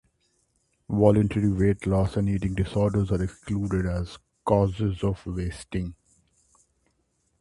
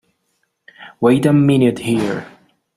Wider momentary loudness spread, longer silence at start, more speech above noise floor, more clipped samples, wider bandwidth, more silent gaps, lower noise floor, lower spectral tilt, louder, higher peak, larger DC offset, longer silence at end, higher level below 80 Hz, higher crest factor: about the same, 11 LU vs 9 LU; about the same, 0.9 s vs 0.8 s; second, 47 dB vs 54 dB; neither; second, 11.5 kHz vs 13.5 kHz; neither; about the same, -71 dBFS vs -68 dBFS; about the same, -8.5 dB/octave vs -7.5 dB/octave; second, -26 LUFS vs -15 LUFS; about the same, -4 dBFS vs -2 dBFS; neither; first, 1.5 s vs 0.5 s; first, -40 dBFS vs -54 dBFS; first, 22 dB vs 16 dB